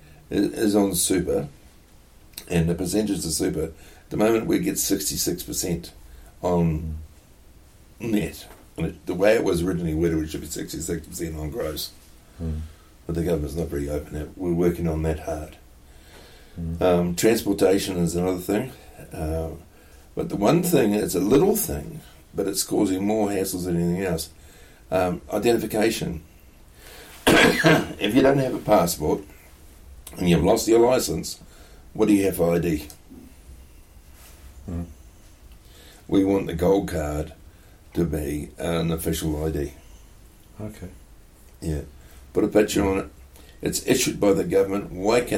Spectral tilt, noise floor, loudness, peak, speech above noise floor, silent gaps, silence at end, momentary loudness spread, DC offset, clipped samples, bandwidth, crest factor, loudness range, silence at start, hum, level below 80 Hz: -5 dB/octave; -51 dBFS; -23 LUFS; -6 dBFS; 28 dB; none; 0 s; 17 LU; under 0.1%; under 0.1%; 16.5 kHz; 18 dB; 8 LU; 0.3 s; none; -42 dBFS